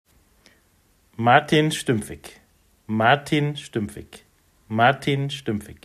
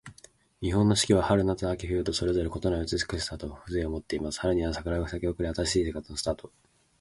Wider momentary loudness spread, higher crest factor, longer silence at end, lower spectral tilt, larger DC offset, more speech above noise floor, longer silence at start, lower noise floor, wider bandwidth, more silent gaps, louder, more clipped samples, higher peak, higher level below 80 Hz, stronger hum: first, 13 LU vs 10 LU; about the same, 22 dB vs 20 dB; second, 0.1 s vs 0.5 s; about the same, -5.5 dB/octave vs -5 dB/octave; neither; first, 40 dB vs 29 dB; first, 1.2 s vs 0.05 s; first, -61 dBFS vs -57 dBFS; first, 14.5 kHz vs 11.5 kHz; neither; first, -22 LUFS vs -29 LUFS; neither; first, -2 dBFS vs -8 dBFS; second, -58 dBFS vs -42 dBFS; neither